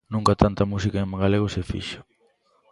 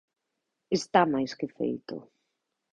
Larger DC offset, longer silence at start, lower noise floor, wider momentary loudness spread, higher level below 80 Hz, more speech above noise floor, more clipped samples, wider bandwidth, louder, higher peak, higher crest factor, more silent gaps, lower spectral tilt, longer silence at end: neither; second, 0.1 s vs 0.7 s; second, -64 dBFS vs -83 dBFS; second, 12 LU vs 16 LU; first, -38 dBFS vs -70 dBFS; second, 42 dB vs 55 dB; neither; first, 11.5 kHz vs 10 kHz; first, -23 LUFS vs -28 LUFS; first, 0 dBFS vs -8 dBFS; about the same, 24 dB vs 24 dB; neither; first, -7 dB/octave vs -5 dB/octave; about the same, 0.7 s vs 0.7 s